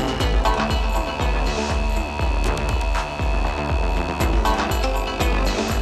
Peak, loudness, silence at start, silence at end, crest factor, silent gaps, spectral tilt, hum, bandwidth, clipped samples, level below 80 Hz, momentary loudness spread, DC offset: -6 dBFS; -22 LUFS; 0 s; 0 s; 14 dB; none; -5 dB/octave; none; 14 kHz; under 0.1%; -22 dBFS; 3 LU; under 0.1%